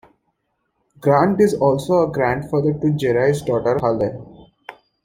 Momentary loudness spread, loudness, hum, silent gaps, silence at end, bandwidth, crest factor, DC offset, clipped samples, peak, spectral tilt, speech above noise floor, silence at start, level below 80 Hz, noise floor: 6 LU; -18 LUFS; none; none; 0.35 s; 16 kHz; 18 dB; under 0.1%; under 0.1%; -2 dBFS; -7.5 dB/octave; 54 dB; 1 s; -50 dBFS; -71 dBFS